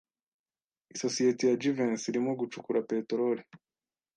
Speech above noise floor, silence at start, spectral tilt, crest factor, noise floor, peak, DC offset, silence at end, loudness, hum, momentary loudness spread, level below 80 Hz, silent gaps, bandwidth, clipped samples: over 60 dB; 0.95 s; -4.5 dB/octave; 16 dB; under -90 dBFS; -16 dBFS; under 0.1%; 0.6 s; -31 LUFS; none; 9 LU; -80 dBFS; none; 9.6 kHz; under 0.1%